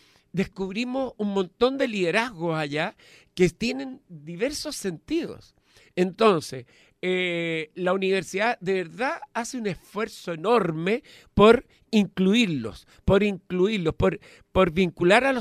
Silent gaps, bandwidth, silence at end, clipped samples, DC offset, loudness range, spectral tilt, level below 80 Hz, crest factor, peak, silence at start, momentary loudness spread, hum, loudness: none; 14 kHz; 0 s; under 0.1%; under 0.1%; 5 LU; -5.5 dB/octave; -48 dBFS; 22 dB; -2 dBFS; 0.35 s; 11 LU; none; -25 LUFS